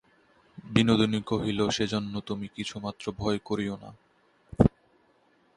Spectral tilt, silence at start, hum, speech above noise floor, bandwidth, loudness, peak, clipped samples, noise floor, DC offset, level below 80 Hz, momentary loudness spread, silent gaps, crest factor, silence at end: -6 dB/octave; 0.55 s; none; 37 dB; 11 kHz; -28 LUFS; -4 dBFS; under 0.1%; -65 dBFS; under 0.1%; -48 dBFS; 12 LU; none; 26 dB; 0.9 s